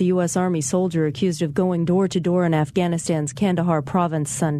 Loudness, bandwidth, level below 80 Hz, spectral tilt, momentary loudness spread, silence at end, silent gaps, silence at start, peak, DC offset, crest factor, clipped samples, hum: -21 LUFS; 13 kHz; -54 dBFS; -6 dB/octave; 3 LU; 0 s; none; 0 s; -6 dBFS; under 0.1%; 14 dB; under 0.1%; none